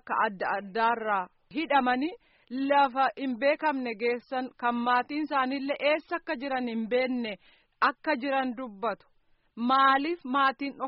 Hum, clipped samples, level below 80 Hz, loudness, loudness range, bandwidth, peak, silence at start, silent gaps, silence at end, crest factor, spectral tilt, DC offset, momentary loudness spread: none; under 0.1%; -70 dBFS; -28 LUFS; 2 LU; 5.8 kHz; -12 dBFS; 0.05 s; none; 0 s; 16 dB; -1.5 dB/octave; under 0.1%; 10 LU